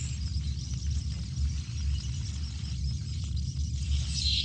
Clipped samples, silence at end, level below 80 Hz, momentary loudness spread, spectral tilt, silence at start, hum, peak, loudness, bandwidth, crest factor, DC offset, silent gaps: under 0.1%; 0 s; -34 dBFS; 4 LU; -4 dB/octave; 0 s; none; -16 dBFS; -33 LUFS; 9.2 kHz; 16 dB; under 0.1%; none